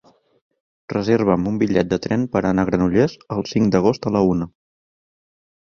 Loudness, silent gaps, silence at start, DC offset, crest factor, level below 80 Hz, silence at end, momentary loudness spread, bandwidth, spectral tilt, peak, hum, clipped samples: -19 LUFS; none; 0.9 s; under 0.1%; 18 dB; -46 dBFS; 1.25 s; 7 LU; 7 kHz; -7.5 dB/octave; -2 dBFS; none; under 0.1%